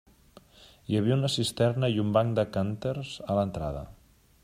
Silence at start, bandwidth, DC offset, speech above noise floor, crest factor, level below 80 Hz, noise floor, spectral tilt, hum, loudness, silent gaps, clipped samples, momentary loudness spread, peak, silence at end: 0.6 s; 15 kHz; under 0.1%; 29 dB; 18 dB; -52 dBFS; -56 dBFS; -6.5 dB/octave; none; -28 LUFS; none; under 0.1%; 10 LU; -10 dBFS; 0.5 s